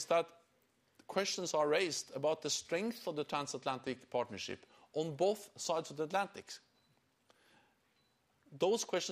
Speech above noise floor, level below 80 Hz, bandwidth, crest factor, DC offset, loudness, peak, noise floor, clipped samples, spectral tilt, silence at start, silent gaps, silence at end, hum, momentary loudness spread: 39 dB; -82 dBFS; 15.5 kHz; 20 dB; under 0.1%; -37 LUFS; -20 dBFS; -76 dBFS; under 0.1%; -3 dB/octave; 0 s; none; 0 s; none; 11 LU